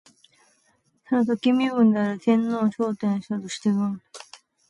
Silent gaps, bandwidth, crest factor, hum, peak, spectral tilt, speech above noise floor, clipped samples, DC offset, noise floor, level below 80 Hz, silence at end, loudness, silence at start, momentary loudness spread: none; 11 kHz; 16 dB; none; -8 dBFS; -6.5 dB/octave; 44 dB; under 0.1%; under 0.1%; -66 dBFS; -70 dBFS; 0.45 s; -23 LUFS; 1.1 s; 10 LU